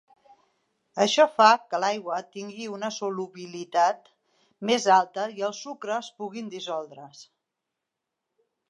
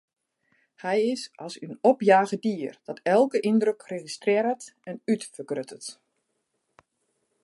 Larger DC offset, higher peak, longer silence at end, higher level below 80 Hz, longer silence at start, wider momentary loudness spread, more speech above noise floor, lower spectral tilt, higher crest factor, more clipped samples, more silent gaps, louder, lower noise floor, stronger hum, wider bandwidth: neither; about the same, -4 dBFS vs -4 dBFS; about the same, 1.45 s vs 1.5 s; about the same, -86 dBFS vs -82 dBFS; about the same, 0.95 s vs 0.85 s; about the same, 18 LU vs 17 LU; first, 59 dB vs 52 dB; second, -3 dB/octave vs -5 dB/octave; about the same, 24 dB vs 22 dB; neither; neither; about the same, -25 LUFS vs -25 LUFS; first, -85 dBFS vs -77 dBFS; neither; about the same, 11.5 kHz vs 11.5 kHz